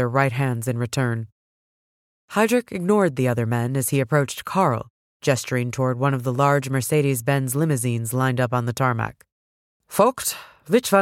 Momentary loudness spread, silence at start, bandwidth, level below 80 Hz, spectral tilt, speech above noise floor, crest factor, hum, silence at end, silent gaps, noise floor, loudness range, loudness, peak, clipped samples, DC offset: 7 LU; 0 s; 16.5 kHz; -60 dBFS; -5.5 dB/octave; over 69 dB; 18 dB; none; 0 s; 1.32-2.28 s, 4.90-5.20 s, 9.32-9.80 s; under -90 dBFS; 2 LU; -22 LUFS; -4 dBFS; under 0.1%; under 0.1%